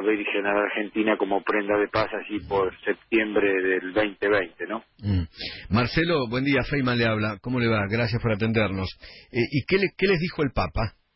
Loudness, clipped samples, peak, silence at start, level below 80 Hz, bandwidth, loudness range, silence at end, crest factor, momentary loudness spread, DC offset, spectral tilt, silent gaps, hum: -25 LUFS; under 0.1%; -10 dBFS; 0 s; -44 dBFS; 5.8 kHz; 1 LU; 0.25 s; 16 dB; 8 LU; under 0.1%; -10.5 dB/octave; none; none